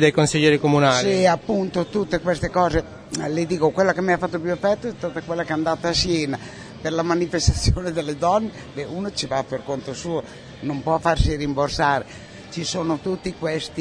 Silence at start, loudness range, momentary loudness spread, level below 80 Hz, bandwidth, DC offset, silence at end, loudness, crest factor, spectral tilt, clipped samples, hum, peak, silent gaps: 0 s; 4 LU; 12 LU; -36 dBFS; 10.5 kHz; under 0.1%; 0 s; -22 LUFS; 18 dB; -5 dB/octave; under 0.1%; none; -2 dBFS; none